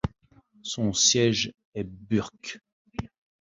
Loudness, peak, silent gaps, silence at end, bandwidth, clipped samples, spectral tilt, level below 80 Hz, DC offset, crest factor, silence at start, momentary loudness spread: -25 LUFS; -8 dBFS; 1.65-1.72 s, 2.72-2.85 s; 0.35 s; 8 kHz; under 0.1%; -3 dB/octave; -50 dBFS; under 0.1%; 22 dB; 0.05 s; 20 LU